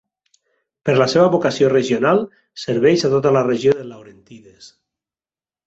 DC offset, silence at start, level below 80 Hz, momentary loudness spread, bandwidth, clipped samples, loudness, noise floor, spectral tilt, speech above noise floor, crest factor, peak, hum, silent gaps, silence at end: under 0.1%; 0.85 s; -58 dBFS; 11 LU; 8 kHz; under 0.1%; -16 LUFS; under -90 dBFS; -6 dB/octave; over 73 dB; 16 dB; -2 dBFS; none; none; 1 s